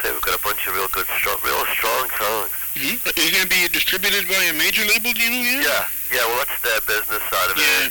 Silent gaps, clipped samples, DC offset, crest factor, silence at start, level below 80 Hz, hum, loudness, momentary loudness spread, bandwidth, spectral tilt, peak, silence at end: none; under 0.1%; under 0.1%; 16 dB; 0 s; -46 dBFS; none; -18 LUFS; 5 LU; 19.5 kHz; -0.5 dB/octave; -4 dBFS; 0 s